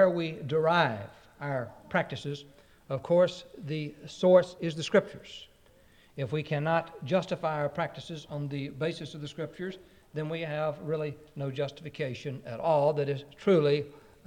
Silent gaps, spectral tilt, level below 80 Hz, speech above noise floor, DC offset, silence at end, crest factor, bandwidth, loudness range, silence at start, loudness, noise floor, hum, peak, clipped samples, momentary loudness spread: none; -6.5 dB/octave; -66 dBFS; 30 dB; under 0.1%; 0.3 s; 22 dB; 10 kHz; 7 LU; 0 s; -30 LUFS; -60 dBFS; none; -8 dBFS; under 0.1%; 16 LU